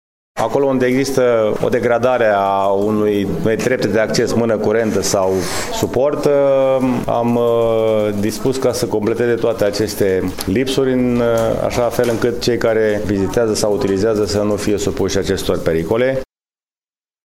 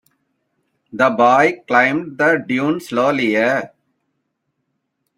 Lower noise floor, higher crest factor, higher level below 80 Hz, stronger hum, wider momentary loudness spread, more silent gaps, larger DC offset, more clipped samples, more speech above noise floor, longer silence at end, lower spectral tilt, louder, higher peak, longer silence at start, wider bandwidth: first, under -90 dBFS vs -72 dBFS; about the same, 16 dB vs 18 dB; first, -40 dBFS vs -64 dBFS; neither; second, 4 LU vs 7 LU; neither; neither; neither; first, over 75 dB vs 57 dB; second, 1 s vs 1.5 s; about the same, -5 dB/octave vs -5.5 dB/octave; about the same, -16 LUFS vs -16 LUFS; about the same, 0 dBFS vs -2 dBFS; second, 0.35 s vs 0.95 s; about the same, 16.5 kHz vs 16 kHz